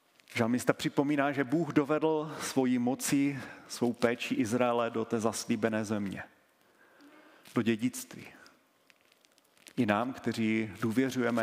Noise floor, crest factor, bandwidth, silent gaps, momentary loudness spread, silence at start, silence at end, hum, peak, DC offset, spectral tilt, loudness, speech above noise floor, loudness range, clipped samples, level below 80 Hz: -66 dBFS; 24 dB; 16 kHz; none; 10 LU; 0.3 s; 0 s; none; -6 dBFS; under 0.1%; -5 dB/octave; -31 LUFS; 36 dB; 8 LU; under 0.1%; -74 dBFS